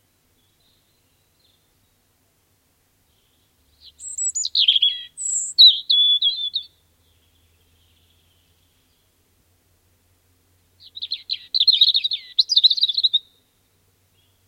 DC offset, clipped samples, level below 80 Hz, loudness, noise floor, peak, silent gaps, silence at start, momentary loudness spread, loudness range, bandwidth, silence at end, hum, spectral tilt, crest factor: under 0.1%; under 0.1%; -72 dBFS; -16 LUFS; -64 dBFS; -2 dBFS; none; 4 s; 18 LU; 16 LU; 16.5 kHz; 1.3 s; none; 4.5 dB/octave; 20 dB